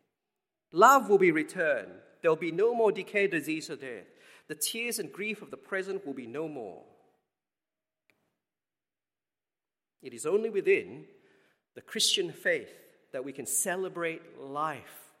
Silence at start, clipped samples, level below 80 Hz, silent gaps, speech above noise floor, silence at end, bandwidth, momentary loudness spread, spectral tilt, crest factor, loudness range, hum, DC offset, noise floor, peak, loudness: 0.75 s; under 0.1%; -88 dBFS; none; over 61 dB; 0.2 s; 16 kHz; 19 LU; -2.5 dB/octave; 26 dB; 15 LU; none; under 0.1%; under -90 dBFS; -6 dBFS; -29 LUFS